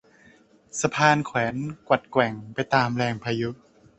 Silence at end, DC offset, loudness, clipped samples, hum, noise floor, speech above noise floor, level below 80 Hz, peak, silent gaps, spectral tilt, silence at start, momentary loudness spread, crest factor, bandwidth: 0.45 s; under 0.1%; -24 LUFS; under 0.1%; none; -56 dBFS; 32 dB; -60 dBFS; -4 dBFS; none; -5 dB/octave; 0.75 s; 11 LU; 22 dB; 8.4 kHz